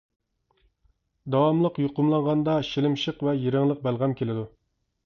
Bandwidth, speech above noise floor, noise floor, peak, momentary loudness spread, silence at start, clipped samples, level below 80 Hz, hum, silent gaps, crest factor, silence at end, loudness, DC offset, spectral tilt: 6.8 kHz; 44 dB; -68 dBFS; -10 dBFS; 8 LU; 1.25 s; under 0.1%; -60 dBFS; none; none; 16 dB; 0.6 s; -25 LUFS; under 0.1%; -8 dB/octave